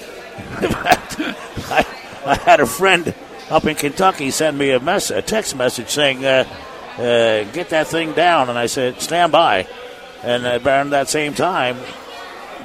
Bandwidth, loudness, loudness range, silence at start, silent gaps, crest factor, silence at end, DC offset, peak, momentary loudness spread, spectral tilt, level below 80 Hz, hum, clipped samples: 16 kHz; -17 LUFS; 2 LU; 0 s; none; 18 dB; 0 s; under 0.1%; 0 dBFS; 17 LU; -3.5 dB/octave; -46 dBFS; none; under 0.1%